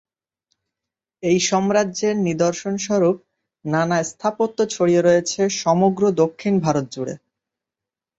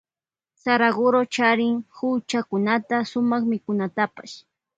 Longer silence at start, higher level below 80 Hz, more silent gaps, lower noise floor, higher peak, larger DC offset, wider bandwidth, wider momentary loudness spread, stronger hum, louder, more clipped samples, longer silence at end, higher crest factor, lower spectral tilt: first, 1.2 s vs 0.65 s; first, -62 dBFS vs -68 dBFS; neither; about the same, -88 dBFS vs under -90 dBFS; about the same, -4 dBFS vs -4 dBFS; neither; about the same, 8 kHz vs 8 kHz; about the same, 10 LU vs 8 LU; neither; about the same, -20 LUFS vs -22 LUFS; neither; first, 1 s vs 0.4 s; about the same, 16 dB vs 20 dB; about the same, -5 dB/octave vs -5 dB/octave